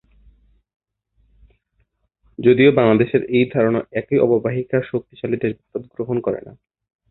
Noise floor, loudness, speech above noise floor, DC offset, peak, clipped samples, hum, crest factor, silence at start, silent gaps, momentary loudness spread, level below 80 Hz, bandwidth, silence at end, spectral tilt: -67 dBFS; -18 LUFS; 49 dB; under 0.1%; -2 dBFS; under 0.1%; none; 18 dB; 2.4 s; none; 14 LU; -54 dBFS; 4.1 kHz; 0.6 s; -12 dB/octave